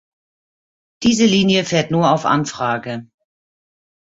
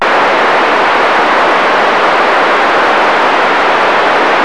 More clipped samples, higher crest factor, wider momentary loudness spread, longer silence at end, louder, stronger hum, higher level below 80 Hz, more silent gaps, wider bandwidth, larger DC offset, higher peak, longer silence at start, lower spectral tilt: neither; first, 16 dB vs 6 dB; first, 10 LU vs 0 LU; first, 1.1 s vs 0 s; second, -16 LUFS vs -8 LUFS; neither; second, -54 dBFS vs -48 dBFS; neither; second, 8 kHz vs 11 kHz; second, under 0.1% vs 2%; about the same, -2 dBFS vs -2 dBFS; first, 1 s vs 0 s; first, -5 dB/octave vs -3 dB/octave